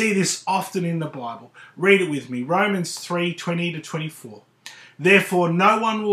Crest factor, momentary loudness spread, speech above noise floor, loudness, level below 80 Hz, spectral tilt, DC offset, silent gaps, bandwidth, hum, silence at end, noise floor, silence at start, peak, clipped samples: 22 dB; 18 LU; 23 dB; -21 LUFS; -78 dBFS; -4.5 dB/octave; under 0.1%; none; 15.5 kHz; none; 0 s; -44 dBFS; 0 s; 0 dBFS; under 0.1%